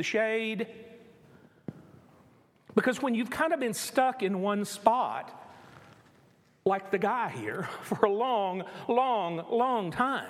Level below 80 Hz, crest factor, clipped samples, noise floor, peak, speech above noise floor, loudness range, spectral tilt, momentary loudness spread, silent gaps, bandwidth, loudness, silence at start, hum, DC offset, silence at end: -72 dBFS; 24 dB; under 0.1%; -62 dBFS; -6 dBFS; 34 dB; 4 LU; -4.5 dB/octave; 13 LU; none; 16 kHz; -29 LUFS; 0 s; none; under 0.1%; 0 s